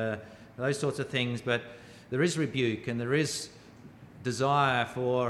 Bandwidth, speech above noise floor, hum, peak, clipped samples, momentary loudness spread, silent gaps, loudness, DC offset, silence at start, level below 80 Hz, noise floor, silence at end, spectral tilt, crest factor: 14 kHz; 22 dB; none; -12 dBFS; under 0.1%; 13 LU; none; -30 LUFS; under 0.1%; 0 s; -66 dBFS; -51 dBFS; 0 s; -5 dB/octave; 18 dB